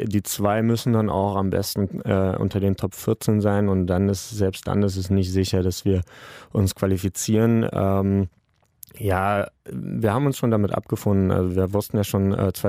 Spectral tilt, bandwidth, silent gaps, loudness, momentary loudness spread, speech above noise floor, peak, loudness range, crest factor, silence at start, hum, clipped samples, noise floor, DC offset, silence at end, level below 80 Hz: -6.5 dB/octave; 16 kHz; none; -22 LUFS; 5 LU; 28 dB; -6 dBFS; 1 LU; 16 dB; 0 s; none; under 0.1%; -50 dBFS; under 0.1%; 0 s; -48 dBFS